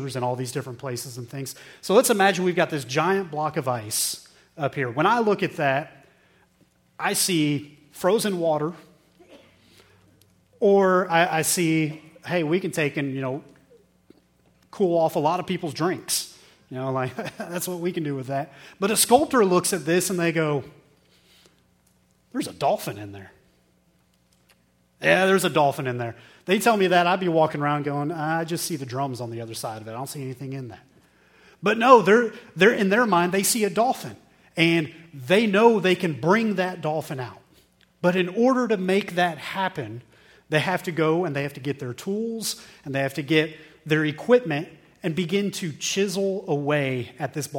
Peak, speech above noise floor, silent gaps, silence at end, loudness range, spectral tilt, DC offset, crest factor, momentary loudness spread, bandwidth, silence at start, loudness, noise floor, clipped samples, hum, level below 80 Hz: 0 dBFS; 41 dB; none; 0 s; 7 LU; -4.5 dB/octave; under 0.1%; 24 dB; 15 LU; 17.5 kHz; 0 s; -23 LUFS; -63 dBFS; under 0.1%; none; -68 dBFS